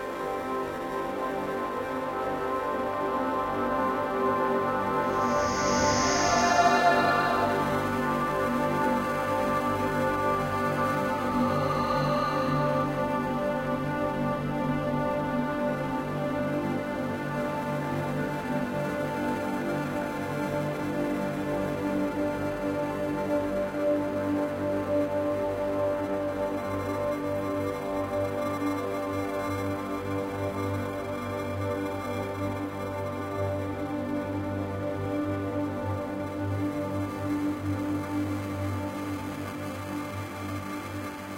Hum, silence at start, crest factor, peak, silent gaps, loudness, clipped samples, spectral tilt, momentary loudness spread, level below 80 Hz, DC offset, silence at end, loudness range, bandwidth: none; 0 s; 18 dB; -10 dBFS; none; -29 LUFS; under 0.1%; -5.5 dB/octave; 7 LU; -52 dBFS; under 0.1%; 0 s; 8 LU; 16 kHz